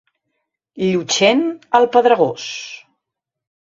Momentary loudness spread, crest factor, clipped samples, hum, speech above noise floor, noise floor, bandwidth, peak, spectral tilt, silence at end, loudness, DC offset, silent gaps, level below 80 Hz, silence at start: 16 LU; 18 dB; under 0.1%; none; 66 dB; -82 dBFS; 7.8 kHz; 0 dBFS; -3.5 dB/octave; 1 s; -16 LUFS; under 0.1%; none; -62 dBFS; 0.75 s